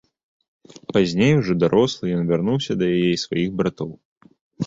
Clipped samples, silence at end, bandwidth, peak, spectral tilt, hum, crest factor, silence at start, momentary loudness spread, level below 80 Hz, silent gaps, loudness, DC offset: under 0.1%; 0 s; 7.8 kHz; -4 dBFS; -6.5 dB/octave; none; 16 dB; 0.9 s; 7 LU; -52 dBFS; 4.05-4.16 s, 4.41-4.51 s; -20 LUFS; under 0.1%